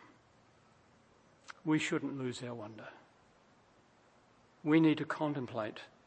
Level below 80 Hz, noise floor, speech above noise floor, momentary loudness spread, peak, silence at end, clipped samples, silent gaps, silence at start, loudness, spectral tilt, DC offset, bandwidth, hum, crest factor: -80 dBFS; -66 dBFS; 32 dB; 20 LU; -16 dBFS; 0.2 s; under 0.1%; none; 1.5 s; -35 LUFS; -6 dB/octave; under 0.1%; 8.8 kHz; none; 22 dB